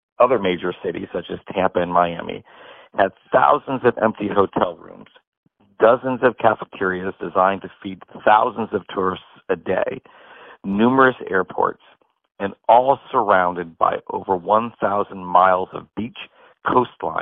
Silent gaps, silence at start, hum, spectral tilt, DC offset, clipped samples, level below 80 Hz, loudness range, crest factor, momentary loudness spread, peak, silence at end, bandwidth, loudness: 5.27-5.43 s; 0.2 s; none; -4 dB/octave; under 0.1%; under 0.1%; -58 dBFS; 3 LU; 18 dB; 14 LU; -2 dBFS; 0 s; 4.1 kHz; -20 LUFS